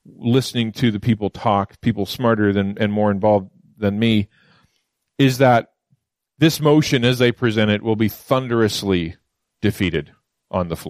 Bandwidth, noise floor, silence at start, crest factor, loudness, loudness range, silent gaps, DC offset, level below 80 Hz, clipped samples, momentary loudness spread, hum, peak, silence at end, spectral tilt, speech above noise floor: 15.5 kHz; -71 dBFS; 0.2 s; 16 dB; -19 LUFS; 3 LU; none; under 0.1%; -50 dBFS; under 0.1%; 8 LU; none; -2 dBFS; 0 s; -6 dB/octave; 53 dB